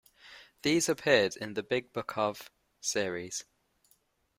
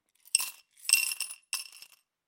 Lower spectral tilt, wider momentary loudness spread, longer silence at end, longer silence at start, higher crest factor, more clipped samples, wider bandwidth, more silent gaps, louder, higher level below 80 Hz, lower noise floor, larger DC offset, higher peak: first, -3 dB/octave vs 6 dB/octave; about the same, 14 LU vs 12 LU; first, 0.95 s vs 0.5 s; about the same, 0.25 s vs 0.35 s; about the same, 24 dB vs 28 dB; neither; about the same, 16 kHz vs 17 kHz; neither; about the same, -31 LUFS vs -29 LUFS; first, -70 dBFS vs under -90 dBFS; first, -71 dBFS vs -57 dBFS; neither; second, -10 dBFS vs -6 dBFS